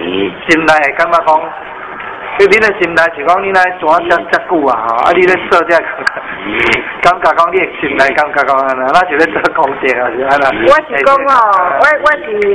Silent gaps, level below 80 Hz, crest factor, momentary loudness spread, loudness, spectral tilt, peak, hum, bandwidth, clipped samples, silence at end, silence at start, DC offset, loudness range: none; -44 dBFS; 10 dB; 8 LU; -10 LUFS; -4.5 dB/octave; 0 dBFS; none; 11 kHz; 2%; 0 s; 0 s; under 0.1%; 1 LU